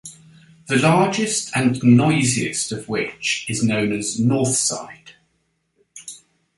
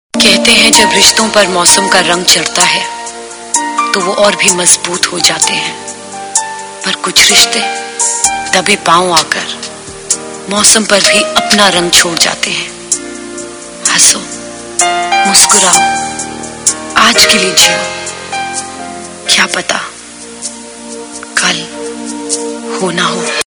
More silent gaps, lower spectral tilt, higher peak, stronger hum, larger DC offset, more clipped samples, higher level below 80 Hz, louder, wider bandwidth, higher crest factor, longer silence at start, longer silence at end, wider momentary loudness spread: neither; first, -4.5 dB/octave vs -0.5 dB/octave; about the same, -2 dBFS vs 0 dBFS; neither; neither; second, under 0.1% vs 2%; second, -56 dBFS vs -44 dBFS; second, -19 LUFS vs -8 LUFS; second, 11.5 kHz vs over 20 kHz; first, 18 dB vs 10 dB; about the same, 0.05 s vs 0.15 s; first, 0.4 s vs 0.05 s; first, 22 LU vs 18 LU